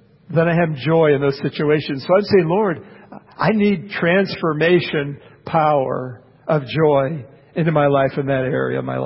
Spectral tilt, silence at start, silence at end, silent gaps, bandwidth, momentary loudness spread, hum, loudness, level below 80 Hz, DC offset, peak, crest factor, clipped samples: -11.5 dB/octave; 0.3 s; 0 s; none; 5.8 kHz; 9 LU; none; -18 LUFS; -54 dBFS; under 0.1%; -2 dBFS; 16 dB; under 0.1%